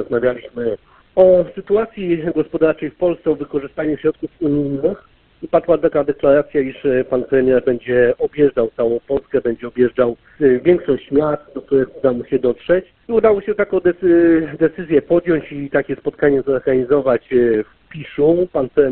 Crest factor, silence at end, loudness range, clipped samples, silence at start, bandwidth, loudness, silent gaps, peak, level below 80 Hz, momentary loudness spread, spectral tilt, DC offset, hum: 16 dB; 0 s; 3 LU; under 0.1%; 0 s; 4.2 kHz; -17 LUFS; none; 0 dBFS; -46 dBFS; 7 LU; -11.5 dB/octave; under 0.1%; none